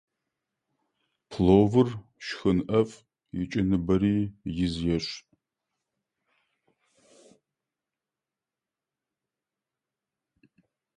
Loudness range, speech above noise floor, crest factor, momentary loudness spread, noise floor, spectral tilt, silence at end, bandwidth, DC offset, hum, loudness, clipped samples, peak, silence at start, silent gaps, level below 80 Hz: 10 LU; 65 dB; 24 dB; 17 LU; -90 dBFS; -7.5 dB/octave; 5.8 s; 9.8 kHz; under 0.1%; none; -26 LUFS; under 0.1%; -6 dBFS; 1.3 s; none; -50 dBFS